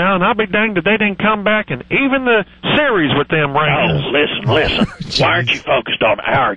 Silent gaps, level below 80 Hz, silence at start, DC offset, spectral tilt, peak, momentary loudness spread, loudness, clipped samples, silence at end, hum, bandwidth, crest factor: none; -38 dBFS; 0 s; 0.6%; -6 dB/octave; -2 dBFS; 3 LU; -14 LUFS; under 0.1%; 0 s; none; 10.5 kHz; 12 dB